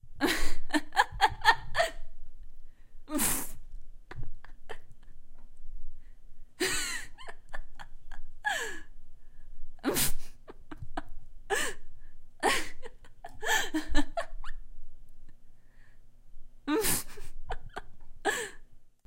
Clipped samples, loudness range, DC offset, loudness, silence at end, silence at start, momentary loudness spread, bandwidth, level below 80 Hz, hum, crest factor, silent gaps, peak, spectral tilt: under 0.1%; 8 LU; under 0.1%; -31 LUFS; 0.2 s; 0.05 s; 24 LU; 16 kHz; -40 dBFS; none; 24 dB; none; -6 dBFS; -2 dB/octave